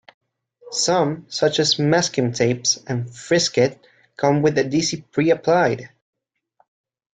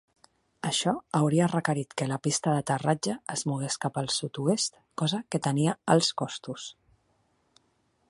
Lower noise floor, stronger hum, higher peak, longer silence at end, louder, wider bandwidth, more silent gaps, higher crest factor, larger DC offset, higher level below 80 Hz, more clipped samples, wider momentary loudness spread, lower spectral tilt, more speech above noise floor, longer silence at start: second, -64 dBFS vs -71 dBFS; neither; first, -4 dBFS vs -8 dBFS; second, 1.25 s vs 1.4 s; first, -20 LUFS vs -28 LUFS; second, 9.4 kHz vs 11.5 kHz; neither; about the same, 18 dB vs 22 dB; neither; first, -60 dBFS vs -70 dBFS; neither; second, 6 LU vs 9 LU; about the same, -4 dB/octave vs -4.5 dB/octave; about the same, 45 dB vs 43 dB; about the same, 0.65 s vs 0.65 s